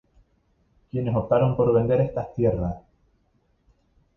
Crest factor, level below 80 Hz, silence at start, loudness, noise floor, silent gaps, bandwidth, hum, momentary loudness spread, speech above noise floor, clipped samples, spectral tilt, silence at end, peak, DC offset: 18 dB; -46 dBFS; 0.95 s; -23 LUFS; -66 dBFS; none; 3.9 kHz; none; 11 LU; 44 dB; under 0.1%; -11 dB/octave; 1.4 s; -8 dBFS; under 0.1%